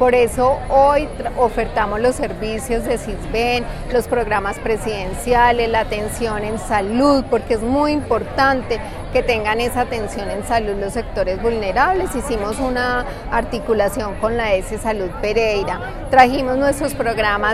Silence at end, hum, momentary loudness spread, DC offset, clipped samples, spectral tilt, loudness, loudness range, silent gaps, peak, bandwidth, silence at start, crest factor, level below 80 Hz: 0 s; none; 8 LU; under 0.1%; under 0.1%; -5 dB/octave; -18 LUFS; 3 LU; none; 0 dBFS; 15 kHz; 0 s; 18 dB; -32 dBFS